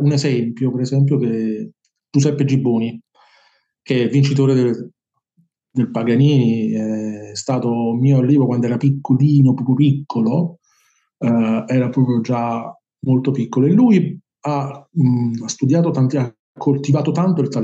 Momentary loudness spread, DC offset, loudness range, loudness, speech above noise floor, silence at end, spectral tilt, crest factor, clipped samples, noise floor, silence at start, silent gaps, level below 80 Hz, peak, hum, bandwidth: 11 LU; under 0.1%; 4 LU; -17 LUFS; 46 dB; 0 s; -7.5 dB/octave; 14 dB; under 0.1%; -62 dBFS; 0 s; 16.39-16.55 s; -72 dBFS; -2 dBFS; none; 8 kHz